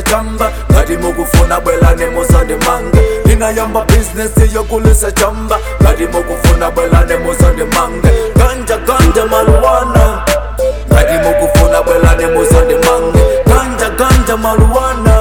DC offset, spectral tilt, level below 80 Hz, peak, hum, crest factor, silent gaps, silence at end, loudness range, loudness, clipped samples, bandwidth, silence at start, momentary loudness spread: 0.9%; -5.5 dB/octave; -12 dBFS; 0 dBFS; none; 8 dB; none; 0 s; 2 LU; -10 LUFS; under 0.1%; 19 kHz; 0 s; 5 LU